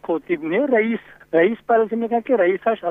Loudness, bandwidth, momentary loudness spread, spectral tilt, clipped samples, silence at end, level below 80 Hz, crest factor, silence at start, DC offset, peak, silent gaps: -20 LUFS; 3.8 kHz; 6 LU; -8.5 dB/octave; under 0.1%; 0 s; -64 dBFS; 16 dB; 0.05 s; under 0.1%; -4 dBFS; none